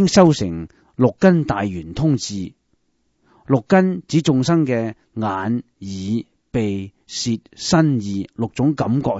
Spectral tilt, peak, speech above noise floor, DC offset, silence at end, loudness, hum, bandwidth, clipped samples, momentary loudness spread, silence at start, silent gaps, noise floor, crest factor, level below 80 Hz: -6 dB/octave; 0 dBFS; 47 dB; under 0.1%; 0 s; -19 LUFS; none; 8 kHz; under 0.1%; 13 LU; 0 s; none; -66 dBFS; 18 dB; -48 dBFS